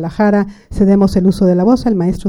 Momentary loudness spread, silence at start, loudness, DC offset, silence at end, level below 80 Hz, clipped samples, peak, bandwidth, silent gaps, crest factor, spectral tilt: 5 LU; 0 s; -12 LUFS; under 0.1%; 0 s; -32 dBFS; under 0.1%; -2 dBFS; 11.5 kHz; none; 10 dB; -8.5 dB/octave